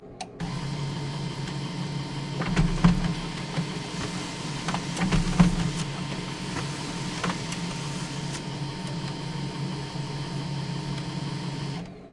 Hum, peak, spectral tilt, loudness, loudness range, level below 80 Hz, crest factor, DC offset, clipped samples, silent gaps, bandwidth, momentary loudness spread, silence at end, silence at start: none; -6 dBFS; -5.5 dB/octave; -30 LUFS; 5 LU; -40 dBFS; 24 dB; under 0.1%; under 0.1%; none; 11.5 kHz; 10 LU; 0.05 s; 0 s